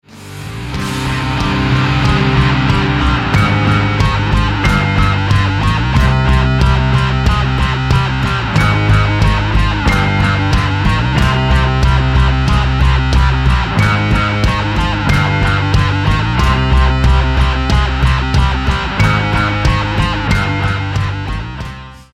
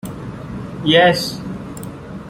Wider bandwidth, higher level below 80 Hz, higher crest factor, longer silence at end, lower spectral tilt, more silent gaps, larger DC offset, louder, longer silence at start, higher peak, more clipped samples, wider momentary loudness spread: second, 12 kHz vs 16.5 kHz; first, -18 dBFS vs -44 dBFS; second, 12 dB vs 18 dB; about the same, 0.1 s vs 0 s; about the same, -6 dB/octave vs -5 dB/octave; neither; neither; about the same, -13 LUFS vs -15 LUFS; about the same, 0.15 s vs 0.05 s; about the same, 0 dBFS vs -2 dBFS; neither; second, 4 LU vs 19 LU